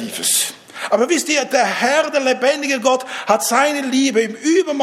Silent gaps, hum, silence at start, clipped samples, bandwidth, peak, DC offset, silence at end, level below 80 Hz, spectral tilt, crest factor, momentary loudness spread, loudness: none; none; 0 s; under 0.1%; 16 kHz; 0 dBFS; under 0.1%; 0 s; -76 dBFS; -1.5 dB/octave; 16 dB; 3 LU; -16 LUFS